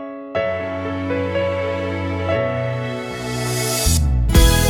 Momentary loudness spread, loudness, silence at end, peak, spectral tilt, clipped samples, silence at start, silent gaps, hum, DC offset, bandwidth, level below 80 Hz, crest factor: 8 LU; -20 LUFS; 0 s; -2 dBFS; -4.5 dB/octave; under 0.1%; 0 s; none; none; under 0.1%; over 20 kHz; -24 dBFS; 18 dB